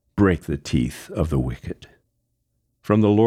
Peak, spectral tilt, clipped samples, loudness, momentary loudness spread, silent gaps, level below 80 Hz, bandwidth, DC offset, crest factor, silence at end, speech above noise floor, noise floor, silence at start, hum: -4 dBFS; -7.5 dB/octave; under 0.1%; -23 LUFS; 17 LU; none; -38 dBFS; 15 kHz; under 0.1%; 18 dB; 0 s; 52 dB; -72 dBFS; 0.15 s; none